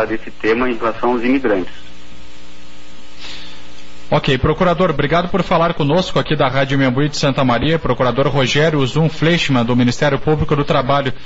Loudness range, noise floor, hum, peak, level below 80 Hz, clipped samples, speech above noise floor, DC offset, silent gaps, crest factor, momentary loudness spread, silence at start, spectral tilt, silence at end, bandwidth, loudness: 7 LU; -41 dBFS; none; -4 dBFS; -34 dBFS; under 0.1%; 26 dB; 5%; none; 12 dB; 6 LU; 0 s; -4.5 dB/octave; 0 s; 8 kHz; -16 LUFS